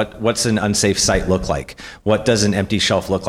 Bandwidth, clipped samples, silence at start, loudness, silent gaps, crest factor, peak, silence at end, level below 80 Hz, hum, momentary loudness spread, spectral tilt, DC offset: 16 kHz; under 0.1%; 0 s; -17 LUFS; none; 14 dB; -4 dBFS; 0 s; -34 dBFS; none; 9 LU; -4 dB/octave; under 0.1%